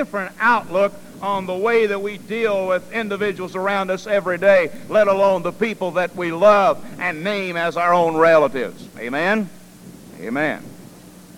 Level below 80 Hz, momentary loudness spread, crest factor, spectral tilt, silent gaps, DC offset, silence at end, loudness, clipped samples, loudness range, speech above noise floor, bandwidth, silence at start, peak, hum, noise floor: -58 dBFS; 11 LU; 18 dB; -5.5 dB/octave; none; under 0.1%; 0.15 s; -19 LUFS; under 0.1%; 4 LU; 23 dB; 16 kHz; 0 s; -2 dBFS; none; -42 dBFS